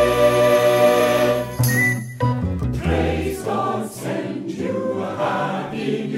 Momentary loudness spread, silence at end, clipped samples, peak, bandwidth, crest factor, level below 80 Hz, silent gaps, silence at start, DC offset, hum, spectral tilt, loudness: 11 LU; 0 s; under 0.1%; -4 dBFS; 16.5 kHz; 14 dB; -38 dBFS; none; 0 s; under 0.1%; none; -5.5 dB/octave; -20 LUFS